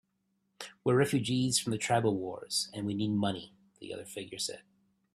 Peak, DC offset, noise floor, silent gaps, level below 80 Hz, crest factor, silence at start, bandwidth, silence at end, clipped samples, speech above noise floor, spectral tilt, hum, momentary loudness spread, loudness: -14 dBFS; under 0.1%; -78 dBFS; none; -68 dBFS; 20 dB; 0.6 s; 14.5 kHz; 0.55 s; under 0.1%; 47 dB; -4.5 dB/octave; none; 16 LU; -32 LUFS